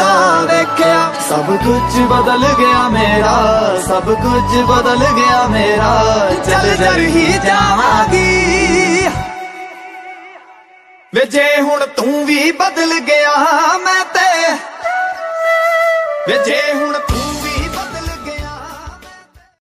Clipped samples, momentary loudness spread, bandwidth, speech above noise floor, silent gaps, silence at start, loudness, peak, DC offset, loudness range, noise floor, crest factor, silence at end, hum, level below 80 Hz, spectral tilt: under 0.1%; 13 LU; 15.5 kHz; 32 dB; none; 0 s; -12 LUFS; 0 dBFS; under 0.1%; 5 LU; -43 dBFS; 12 dB; 0.65 s; none; -30 dBFS; -4 dB/octave